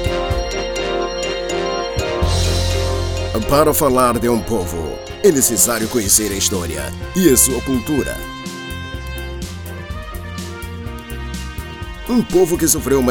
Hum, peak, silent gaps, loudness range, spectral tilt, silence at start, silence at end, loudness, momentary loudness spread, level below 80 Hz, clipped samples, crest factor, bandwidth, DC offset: none; 0 dBFS; none; 13 LU; -4 dB/octave; 0 s; 0 s; -17 LUFS; 16 LU; -30 dBFS; under 0.1%; 18 dB; over 20 kHz; under 0.1%